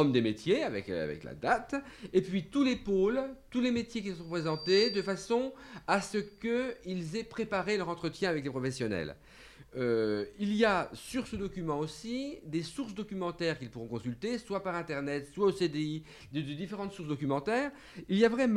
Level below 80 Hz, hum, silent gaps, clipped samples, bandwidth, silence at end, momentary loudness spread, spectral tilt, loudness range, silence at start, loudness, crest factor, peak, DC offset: -60 dBFS; none; none; under 0.1%; 13.5 kHz; 0 s; 11 LU; -5.5 dB/octave; 5 LU; 0 s; -33 LUFS; 20 dB; -12 dBFS; under 0.1%